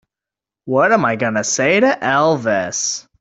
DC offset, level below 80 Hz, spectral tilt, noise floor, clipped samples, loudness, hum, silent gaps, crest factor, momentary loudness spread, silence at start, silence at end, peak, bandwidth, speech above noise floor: under 0.1%; -58 dBFS; -3.5 dB/octave; -87 dBFS; under 0.1%; -16 LUFS; none; none; 14 dB; 6 LU; 0.65 s; 0.2 s; -2 dBFS; 8.4 kHz; 72 dB